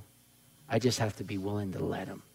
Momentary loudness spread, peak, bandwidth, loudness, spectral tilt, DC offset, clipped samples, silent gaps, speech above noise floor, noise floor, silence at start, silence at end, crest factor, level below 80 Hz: 7 LU; -14 dBFS; 16 kHz; -33 LUFS; -5.5 dB/octave; under 0.1%; under 0.1%; none; 29 dB; -62 dBFS; 0 s; 0.15 s; 20 dB; -66 dBFS